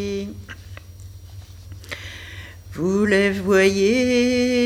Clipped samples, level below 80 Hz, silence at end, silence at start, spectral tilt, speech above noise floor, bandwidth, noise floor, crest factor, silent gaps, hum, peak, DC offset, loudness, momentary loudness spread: under 0.1%; -46 dBFS; 0 s; 0 s; -5 dB/octave; 21 dB; 15.5 kHz; -39 dBFS; 16 dB; none; 50 Hz at -45 dBFS; -4 dBFS; under 0.1%; -19 LUFS; 24 LU